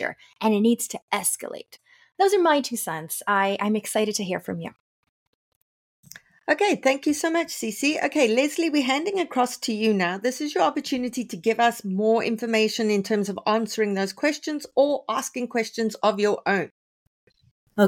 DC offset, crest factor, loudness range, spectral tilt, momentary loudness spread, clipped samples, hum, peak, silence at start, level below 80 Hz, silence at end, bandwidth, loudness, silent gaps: under 0.1%; 18 dB; 4 LU; -4 dB/octave; 8 LU; under 0.1%; none; -8 dBFS; 0 s; -72 dBFS; 0 s; 17 kHz; -24 LUFS; 1.02-1.08 s, 4.80-5.03 s, 5.09-6.03 s, 16.71-17.27 s, 17.51-17.67 s